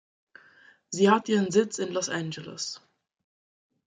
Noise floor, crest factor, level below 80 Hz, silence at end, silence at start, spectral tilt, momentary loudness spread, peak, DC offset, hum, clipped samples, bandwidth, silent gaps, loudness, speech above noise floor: -58 dBFS; 22 dB; -74 dBFS; 1.1 s; 0.9 s; -4.5 dB/octave; 14 LU; -8 dBFS; under 0.1%; none; under 0.1%; 9.6 kHz; none; -27 LUFS; 32 dB